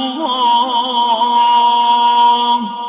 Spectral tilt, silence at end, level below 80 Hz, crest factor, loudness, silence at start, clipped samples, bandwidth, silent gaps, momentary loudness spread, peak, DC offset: -7 dB/octave; 0 s; -74 dBFS; 10 dB; -12 LUFS; 0 s; under 0.1%; 4 kHz; none; 4 LU; -4 dBFS; under 0.1%